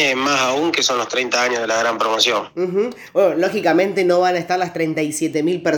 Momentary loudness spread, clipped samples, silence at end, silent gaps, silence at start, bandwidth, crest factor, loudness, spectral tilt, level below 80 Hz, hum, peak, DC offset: 5 LU; under 0.1%; 0 s; none; 0 s; 19.5 kHz; 18 dB; -18 LUFS; -3 dB/octave; -66 dBFS; none; 0 dBFS; under 0.1%